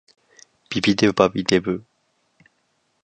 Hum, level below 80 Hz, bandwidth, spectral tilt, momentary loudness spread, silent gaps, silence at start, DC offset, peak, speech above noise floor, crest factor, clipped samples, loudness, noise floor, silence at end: none; -54 dBFS; 9.6 kHz; -5 dB/octave; 11 LU; none; 0.7 s; under 0.1%; 0 dBFS; 49 dB; 22 dB; under 0.1%; -20 LUFS; -68 dBFS; 1.25 s